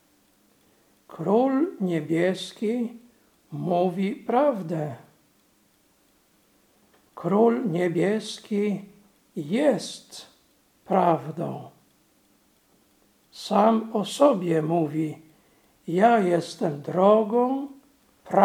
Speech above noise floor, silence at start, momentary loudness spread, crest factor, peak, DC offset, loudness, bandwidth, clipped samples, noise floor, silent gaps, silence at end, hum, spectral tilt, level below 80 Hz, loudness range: 40 dB; 1.1 s; 16 LU; 22 dB; -4 dBFS; under 0.1%; -24 LUFS; 16.5 kHz; under 0.1%; -63 dBFS; none; 0 s; none; -6.5 dB/octave; -76 dBFS; 6 LU